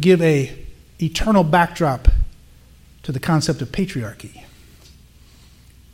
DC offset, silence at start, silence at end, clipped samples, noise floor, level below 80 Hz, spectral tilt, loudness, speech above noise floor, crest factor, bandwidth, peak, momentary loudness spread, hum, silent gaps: under 0.1%; 0 s; 1.65 s; under 0.1%; -47 dBFS; -26 dBFS; -6 dB/octave; -19 LUFS; 30 dB; 20 dB; 16.5 kHz; 0 dBFS; 18 LU; none; none